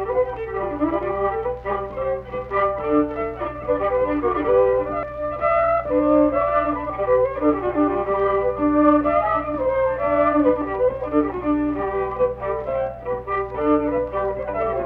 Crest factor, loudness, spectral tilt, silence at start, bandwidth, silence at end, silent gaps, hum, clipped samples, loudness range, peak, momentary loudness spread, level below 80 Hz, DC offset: 16 dB; -21 LUFS; -10 dB/octave; 0 s; 4.3 kHz; 0 s; none; none; under 0.1%; 4 LU; -4 dBFS; 9 LU; -42 dBFS; under 0.1%